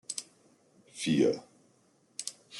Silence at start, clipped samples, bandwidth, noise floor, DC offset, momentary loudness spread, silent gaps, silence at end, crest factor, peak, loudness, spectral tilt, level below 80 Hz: 0.1 s; under 0.1%; 12.5 kHz; -67 dBFS; under 0.1%; 16 LU; none; 0 s; 22 dB; -14 dBFS; -32 LUFS; -4.5 dB/octave; -76 dBFS